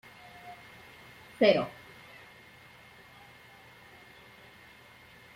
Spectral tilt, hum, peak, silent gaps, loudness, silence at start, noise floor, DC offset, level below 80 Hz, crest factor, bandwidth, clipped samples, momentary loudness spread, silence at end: -5.5 dB/octave; none; -10 dBFS; none; -27 LUFS; 0.45 s; -55 dBFS; under 0.1%; -72 dBFS; 26 dB; 16 kHz; under 0.1%; 27 LU; 3.65 s